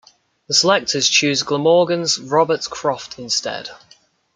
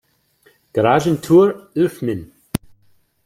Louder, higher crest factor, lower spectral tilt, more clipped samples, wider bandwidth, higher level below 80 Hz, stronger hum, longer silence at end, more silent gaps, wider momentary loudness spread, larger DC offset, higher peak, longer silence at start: about the same, -17 LUFS vs -18 LUFS; about the same, 18 dB vs 18 dB; second, -2.5 dB/octave vs -7 dB/octave; neither; second, 10 kHz vs 16.5 kHz; second, -62 dBFS vs -50 dBFS; neither; about the same, 0.6 s vs 0.7 s; neither; second, 12 LU vs 15 LU; neither; about the same, -2 dBFS vs 0 dBFS; second, 0.5 s vs 0.75 s